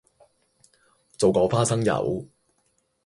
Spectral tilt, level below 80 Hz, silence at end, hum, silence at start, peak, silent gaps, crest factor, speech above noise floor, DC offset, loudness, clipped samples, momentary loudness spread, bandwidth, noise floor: -5.5 dB/octave; -54 dBFS; 0.8 s; none; 1.2 s; -6 dBFS; none; 20 dB; 48 dB; under 0.1%; -23 LUFS; under 0.1%; 8 LU; 11.5 kHz; -70 dBFS